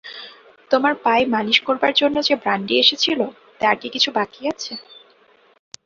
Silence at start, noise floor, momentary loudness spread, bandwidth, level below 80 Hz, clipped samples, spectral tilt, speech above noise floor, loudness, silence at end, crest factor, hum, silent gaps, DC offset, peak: 0.05 s; -55 dBFS; 15 LU; 7.8 kHz; -62 dBFS; under 0.1%; -3 dB/octave; 36 dB; -18 LUFS; 0.85 s; 20 dB; none; none; under 0.1%; -2 dBFS